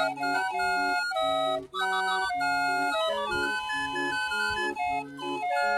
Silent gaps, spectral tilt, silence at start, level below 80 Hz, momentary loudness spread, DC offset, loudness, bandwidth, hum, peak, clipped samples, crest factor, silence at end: none; -2.5 dB/octave; 0 s; -60 dBFS; 3 LU; under 0.1%; -28 LUFS; 14.5 kHz; none; -14 dBFS; under 0.1%; 14 dB; 0 s